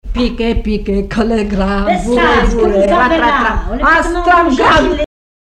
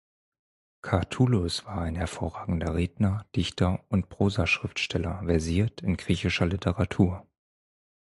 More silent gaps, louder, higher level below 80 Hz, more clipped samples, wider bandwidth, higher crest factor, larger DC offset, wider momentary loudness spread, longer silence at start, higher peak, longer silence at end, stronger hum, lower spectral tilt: neither; first, -12 LUFS vs -28 LUFS; first, -22 dBFS vs -40 dBFS; neither; about the same, 10.5 kHz vs 11.5 kHz; second, 12 dB vs 20 dB; neither; about the same, 7 LU vs 7 LU; second, 0.05 s vs 0.85 s; first, 0 dBFS vs -8 dBFS; second, 0.35 s vs 0.95 s; neither; about the same, -5.5 dB/octave vs -6 dB/octave